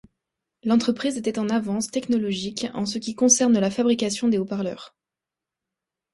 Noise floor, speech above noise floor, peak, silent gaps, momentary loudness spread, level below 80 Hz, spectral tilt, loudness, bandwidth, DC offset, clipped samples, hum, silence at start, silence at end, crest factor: -88 dBFS; 65 dB; -4 dBFS; none; 11 LU; -64 dBFS; -4 dB/octave; -23 LUFS; 11.5 kHz; under 0.1%; under 0.1%; none; 0.65 s; 1.25 s; 20 dB